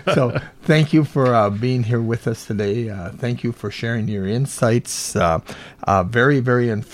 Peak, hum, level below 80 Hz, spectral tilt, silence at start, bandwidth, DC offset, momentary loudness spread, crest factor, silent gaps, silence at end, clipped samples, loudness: -2 dBFS; none; -48 dBFS; -6 dB/octave; 0.05 s; 15.5 kHz; under 0.1%; 10 LU; 16 dB; none; 0 s; under 0.1%; -19 LUFS